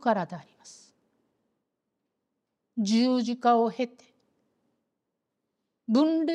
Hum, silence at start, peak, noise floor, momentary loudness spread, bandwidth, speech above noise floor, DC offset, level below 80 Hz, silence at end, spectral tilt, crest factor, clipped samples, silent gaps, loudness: none; 0.05 s; -10 dBFS; -83 dBFS; 15 LU; 10 kHz; 57 dB; under 0.1%; -88 dBFS; 0 s; -5.5 dB/octave; 20 dB; under 0.1%; none; -26 LUFS